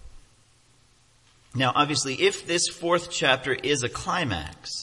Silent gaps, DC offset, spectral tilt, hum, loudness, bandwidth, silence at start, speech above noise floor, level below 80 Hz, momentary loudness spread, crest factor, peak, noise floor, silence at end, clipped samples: none; under 0.1%; -3 dB/octave; none; -24 LUFS; 11.5 kHz; 0.05 s; 35 dB; -54 dBFS; 7 LU; 22 dB; -6 dBFS; -60 dBFS; 0 s; under 0.1%